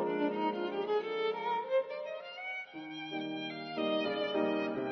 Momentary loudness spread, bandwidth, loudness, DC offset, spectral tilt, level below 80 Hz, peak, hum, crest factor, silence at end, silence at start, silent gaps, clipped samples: 9 LU; 6.4 kHz; -35 LUFS; under 0.1%; -2.5 dB/octave; -82 dBFS; -20 dBFS; none; 16 dB; 0 s; 0 s; none; under 0.1%